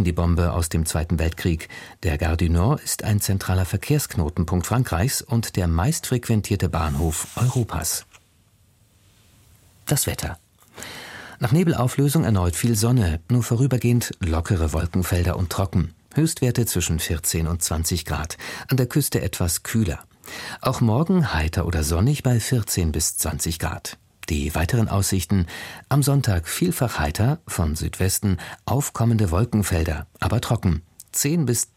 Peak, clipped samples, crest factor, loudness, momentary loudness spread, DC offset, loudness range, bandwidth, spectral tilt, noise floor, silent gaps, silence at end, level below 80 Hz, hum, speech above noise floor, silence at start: -6 dBFS; under 0.1%; 16 dB; -22 LUFS; 8 LU; under 0.1%; 4 LU; 16.5 kHz; -5 dB/octave; -58 dBFS; none; 0.1 s; -34 dBFS; none; 37 dB; 0 s